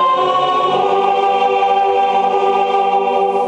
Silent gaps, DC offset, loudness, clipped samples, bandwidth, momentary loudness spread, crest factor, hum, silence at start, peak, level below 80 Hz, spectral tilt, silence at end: none; under 0.1%; -14 LUFS; under 0.1%; 8.8 kHz; 1 LU; 12 dB; none; 0 s; -2 dBFS; -62 dBFS; -4.5 dB/octave; 0 s